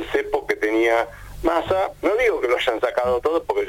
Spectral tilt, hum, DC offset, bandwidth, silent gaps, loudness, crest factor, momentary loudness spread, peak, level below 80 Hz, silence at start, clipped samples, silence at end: -4.5 dB/octave; none; under 0.1%; 17 kHz; none; -21 LUFS; 14 dB; 4 LU; -6 dBFS; -42 dBFS; 0 s; under 0.1%; 0 s